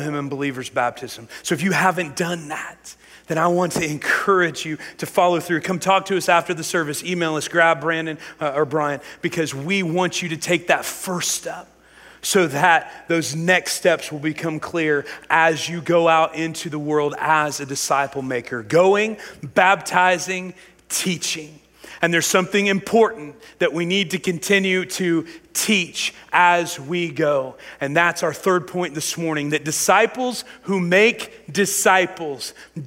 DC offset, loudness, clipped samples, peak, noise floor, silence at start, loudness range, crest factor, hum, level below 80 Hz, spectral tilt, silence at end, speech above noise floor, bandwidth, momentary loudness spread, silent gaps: under 0.1%; -20 LUFS; under 0.1%; 0 dBFS; -47 dBFS; 0 s; 3 LU; 20 dB; none; -62 dBFS; -3.5 dB/octave; 0 s; 27 dB; 16 kHz; 10 LU; none